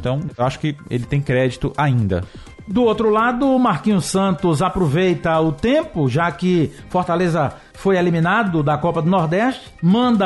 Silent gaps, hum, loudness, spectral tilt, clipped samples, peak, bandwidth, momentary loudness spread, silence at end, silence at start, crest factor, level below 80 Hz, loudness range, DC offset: none; none; -18 LUFS; -7 dB/octave; under 0.1%; -8 dBFS; 11.5 kHz; 6 LU; 0 s; 0 s; 10 dB; -42 dBFS; 1 LU; under 0.1%